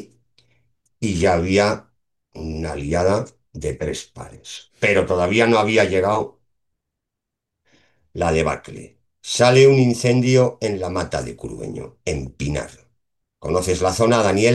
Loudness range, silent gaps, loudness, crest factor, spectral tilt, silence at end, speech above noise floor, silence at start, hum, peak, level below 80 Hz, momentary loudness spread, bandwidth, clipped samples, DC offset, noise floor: 8 LU; none; -19 LUFS; 18 dB; -5.5 dB/octave; 0 s; 64 dB; 0 s; none; -2 dBFS; -42 dBFS; 19 LU; 12.5 kHz; under 0.1%; under 0.1%; -83 dBFS